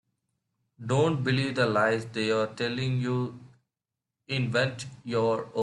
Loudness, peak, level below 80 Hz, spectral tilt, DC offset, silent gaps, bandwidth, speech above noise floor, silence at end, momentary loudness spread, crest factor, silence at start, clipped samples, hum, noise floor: -28 LUFS; -12 dBFS; -64 dBFS; -6 dB/octave; under 0.1%; none; 11 kHz; 61 dB; 0 s; 7 LU; 16 dB; 0.8 s; under 0.1%; none; -88 dBFS